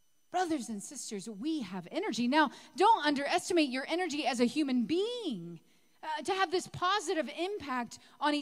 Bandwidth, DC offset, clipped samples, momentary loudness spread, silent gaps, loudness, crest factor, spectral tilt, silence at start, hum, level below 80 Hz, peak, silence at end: 15.5 kHz; under 0.1%; under 0.1%; 12 LU; none; -32 LUFS; 18 dB; -3.5 dB/octave; 0.35 s; none; -74 dBFS; -14 dBFS; 0 s